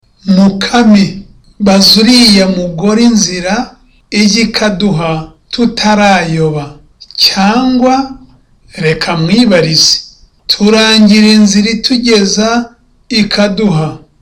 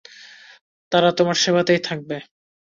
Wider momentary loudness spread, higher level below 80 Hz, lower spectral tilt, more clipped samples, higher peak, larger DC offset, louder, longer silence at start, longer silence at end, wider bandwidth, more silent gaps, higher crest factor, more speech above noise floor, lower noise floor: second, 11 LU vs 14 LU; first, -36 dBFS vs -64 dBFS; about the same, -4 dB/octave vs -4 dB/octave; neither; first, 0 dBFS vs -4 dBFS; neither; first, -8 LUFS vs -19 LUFS; about the same, 0.25 s vs 0.25 s; second, 0.25 s vs 0.5 s; first, 15.5 kHz vs 7.6 kHz; second, none vs 0.61-0.91 s; second, 10 dB vs 18 dB; first, 34 dB vs 26 dB; second, -41 dBFS vs -45 dBFS